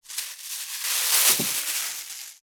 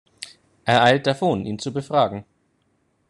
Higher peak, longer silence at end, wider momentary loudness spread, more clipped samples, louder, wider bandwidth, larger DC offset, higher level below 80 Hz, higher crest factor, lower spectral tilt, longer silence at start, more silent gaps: about the same, -4 dBFS vs -2 dBFS; second, 0.1 s vs 0.85 s; second, 15 LU vs 22 LU; neither; about the same, -22 LUFS vs -20 LUFS; first, over 20 kHz vs 11 kHz; neither; second, -80 dBFS vs -60 dBFS; about the same, 22 dB vs 20 dB; second, 1 dB/octave vs -5.5 dB/octave; second, 0.05 s vs 0.2 s; neither